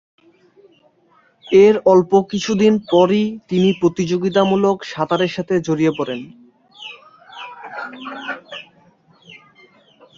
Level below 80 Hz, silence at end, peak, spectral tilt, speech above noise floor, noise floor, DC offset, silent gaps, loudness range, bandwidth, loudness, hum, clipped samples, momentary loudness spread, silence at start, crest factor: -58 dBFS; 1.55 s; -2 dBFS; -6.5 dB/octave; 41 dB; -56 dBFS; under 0.1%; none; 18 LU; 7.6 kHz; -16 LUFS; none; under 0.1%; 22 LU; 1.5 s; 16 dB